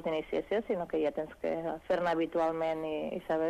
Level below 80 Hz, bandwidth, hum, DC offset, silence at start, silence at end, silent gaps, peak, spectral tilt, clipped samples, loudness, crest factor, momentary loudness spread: -62 dBFS; 13.5 kHz; none; under 0.1%; 0 s; 0 s; none; -20 dBFS; -6.5 dB/octave; under 0.1%; -33 LUFS; 12 dB; 5 LU